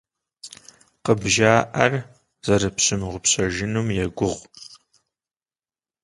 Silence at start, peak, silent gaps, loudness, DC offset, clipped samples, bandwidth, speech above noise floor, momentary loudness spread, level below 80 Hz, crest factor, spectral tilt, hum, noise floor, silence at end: 0.45 s; 0 dBFS; none; -21 LUFS; under 0.1%; under 0.1%; 11.5 kHz; over 69 dB; 23 LU; -46 dBFS; 24 dB; -3.5 dB/octave; none; under -90 dBFS; 1.3 s